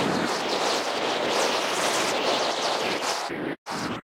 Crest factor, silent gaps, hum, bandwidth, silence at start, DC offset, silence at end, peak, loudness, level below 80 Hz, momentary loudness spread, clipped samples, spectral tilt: 16 dB; 3.58-3.66 s; none; 16 kHz; 0 s; under 0.1%; 0.15 s; -10 dBFS; -25 LUFS; -64 dBFS; 7 LU; under 0.1%; -2.5 dB/octave